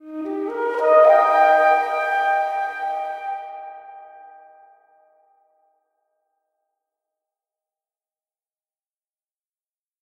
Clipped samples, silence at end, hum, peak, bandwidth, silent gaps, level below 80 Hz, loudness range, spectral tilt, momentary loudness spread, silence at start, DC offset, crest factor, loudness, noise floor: under 0.1%; 5.75 s; none; -4 dBFS; 11.5 kHz; none; -80 dBFS; 19 LU; -2.5 dB/octave; 19 LU; 0.05 s; under 0.1%; 20 dB; -18 LUFS; under -90 dBFS